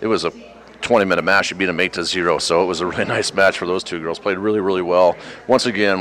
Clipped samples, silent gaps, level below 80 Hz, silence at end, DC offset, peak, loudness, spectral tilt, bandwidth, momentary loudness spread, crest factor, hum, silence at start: under 0.1%; none; -54 dBFS; 0 s; under 0.1%; -4 dBFS; -18 LUFS; -4 dB/octave; 14.5 kHz; 7 LU; 16 dB; none; 0 s